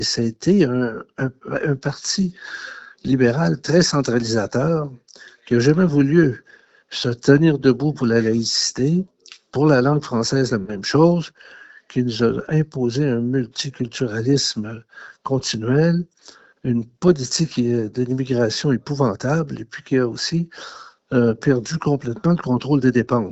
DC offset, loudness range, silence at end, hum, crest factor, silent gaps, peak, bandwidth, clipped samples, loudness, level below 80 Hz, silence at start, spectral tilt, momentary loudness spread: under 0.1%; 4 LU; 0 s; none; 20 dB; none; 0 dBFS; 8.2 kHz; under 0.1%; -20 LUFS; -52 dBFS; 0 s; -5.5 dB/octave; 12 LU